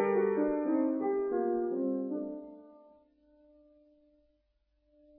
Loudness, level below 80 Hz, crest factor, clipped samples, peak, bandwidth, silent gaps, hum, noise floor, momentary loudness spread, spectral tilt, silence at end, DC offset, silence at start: -32 LUFS; -70 dBFS; 16 dB; under 0.1%; -18 dBFS; 3 kHz; none; none; -75 dBFS; 15 LU; -9 dB/octave; 2.45 s; under 0.1%; 0 s